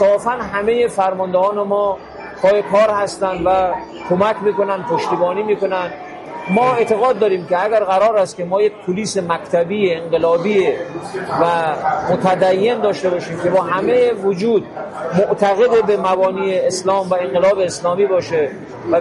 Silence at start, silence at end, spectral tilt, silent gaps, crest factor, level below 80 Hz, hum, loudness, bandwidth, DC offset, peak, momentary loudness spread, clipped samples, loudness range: 0 s; 0 s; -5.5 dB/octave; none; 14 dB; -52 dBFS; none; -16 LUFS; 11.5 kHz; under 0.1%; -2 dBFS; 7 LU; under 0.1%; 2 LU